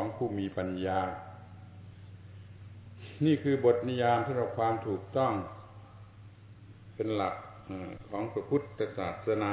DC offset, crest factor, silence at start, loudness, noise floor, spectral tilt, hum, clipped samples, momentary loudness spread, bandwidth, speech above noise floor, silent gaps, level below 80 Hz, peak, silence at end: under 0.1%; 20 dB; 0 s; -32 LUFS; -52 dBFS; -6 dB/octave; none; under 0.1%; 24 LU; 4 kHz; 21 dB; none; -58 dBFS; -14 dBFS; 0 s